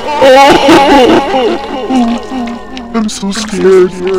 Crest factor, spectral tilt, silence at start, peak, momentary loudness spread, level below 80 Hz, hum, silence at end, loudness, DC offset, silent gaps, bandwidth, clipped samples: 8 dB; -4.5 dB/octave; 0 s; 0 dBFS; 14 LU; -34 dBFS; none; 0 s; -7 LUFS; 2%; none; 16 kHz; 4%